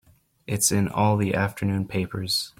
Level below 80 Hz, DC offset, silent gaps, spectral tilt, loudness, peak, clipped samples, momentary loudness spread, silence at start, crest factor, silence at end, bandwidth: -54 dBFS; under 0.1%; none; -4 dB/octave; -24 LUFS; -8 dBFS; under 0.1%; 7 LU; 0.5 s; 18 dB; 0.1 s; 16.5 kHz